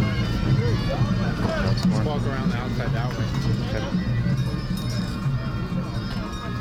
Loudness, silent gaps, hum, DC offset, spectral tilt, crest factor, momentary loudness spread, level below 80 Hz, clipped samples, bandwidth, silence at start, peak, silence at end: -25 LUFS; none; none; under 0.1%; -7 dB/octave; 12 dB; 6 LU; -34 dBFS; under 0.1%; 14.5 kHz; 0 s; -10 dBFS; 0 s